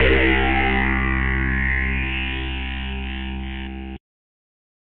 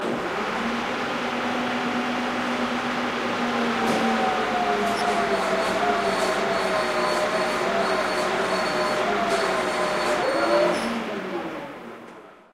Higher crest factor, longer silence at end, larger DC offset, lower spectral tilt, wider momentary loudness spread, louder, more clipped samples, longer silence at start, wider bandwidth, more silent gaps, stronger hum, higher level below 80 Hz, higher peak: about the same, 16 dB vs 16 dB; first, 0.8 s vs 0.2 s; neither; about the same, -4 dB/octave vs -4 dB/octave; first, 14 LU vs 5 LU; first, -21 LUFS vs -24 LUFS; neither; about the same, 0 s vs 0 s; second, 4.2 kHz vs 16 kHz; neither; neither; first, -26 dBFS vs -54 dBFS; first, -4 dBFS vs -8 dBFS